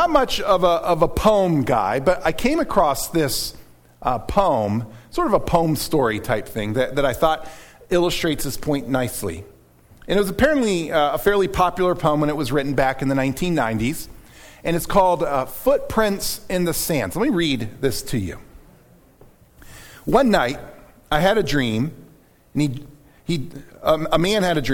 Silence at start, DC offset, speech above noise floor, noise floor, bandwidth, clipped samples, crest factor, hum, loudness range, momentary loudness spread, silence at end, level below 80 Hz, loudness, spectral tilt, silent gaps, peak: 0 s; under 0.1%; 32 dB; -52 dBFS; 19 kHz; under 0.1%; 18 dB; none; 4 LU; 9 LU; 0 s; -38 dBFS; -20 LUFS; -5 dB/octave; none; -2 dBFS